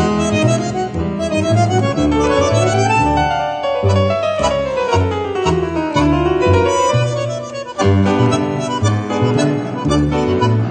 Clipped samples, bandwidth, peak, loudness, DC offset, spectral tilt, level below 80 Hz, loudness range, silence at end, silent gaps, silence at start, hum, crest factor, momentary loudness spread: under 0.1%; 9 kHz; -2 dBFS; -16 LUFS; under 0.1%; -6 dB/octave; -34 dBFS; 1 LU; 0 s; none; 0 s; none; 14 dB; 5 LU